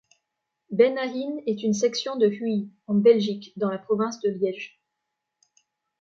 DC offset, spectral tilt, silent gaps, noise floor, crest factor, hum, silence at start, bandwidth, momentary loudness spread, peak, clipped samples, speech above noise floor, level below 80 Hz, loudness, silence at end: under 0.1%; -5.5 dB/octave; none; -82 dBFS; 20 dB; none; 0.7 s; 7.6 kHz; 10 LU; -6 dBFS; under 0.1%; 58 dB; -76 dBFS; -24 LUFS; 1.35 s